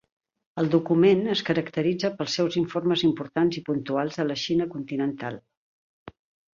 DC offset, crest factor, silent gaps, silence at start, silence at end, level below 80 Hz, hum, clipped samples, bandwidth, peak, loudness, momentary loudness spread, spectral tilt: under 0.1%; 18 dB; 5.57-6.06 s; 0.55 s; 0.45 s; -64 dBFS; none; under 0.1%; 7.4 kHz; -8 dBFS; -25 LUFS; 10 LU; -6 dB/octave